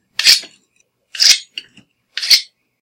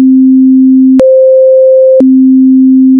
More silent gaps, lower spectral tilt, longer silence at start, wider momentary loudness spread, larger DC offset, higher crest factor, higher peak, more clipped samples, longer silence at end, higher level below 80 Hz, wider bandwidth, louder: neither; second, 4 dB/octave vs -9.5 dB/octave; first, 0.2 s vs 0 s; first, 21 LU vs 0 LU; neither; first, 18 dB vs 4 dB; about the same, 0 dBFS vs 0 dBFS; second, 0.2% vs 0.5%; first, 0.35 s vs 0 s; second, -64 dBFS vs -50 dBFS; first, over 20 kHz vs 1.6 kHz; second, -11 LUFS vs -4 LUFS